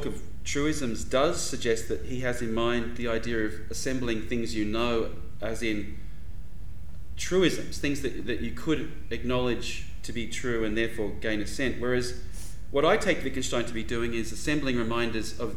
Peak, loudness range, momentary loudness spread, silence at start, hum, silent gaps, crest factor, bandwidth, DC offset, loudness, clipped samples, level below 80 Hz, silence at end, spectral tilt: -8 dBFS; 3 LU; 12 LU; 0 s; none; none; 22 dB; 18.5 kHz; 3%; -30 LUFS; under 0.1%; -42 dBFS; 0 s; -4.5 dB/octave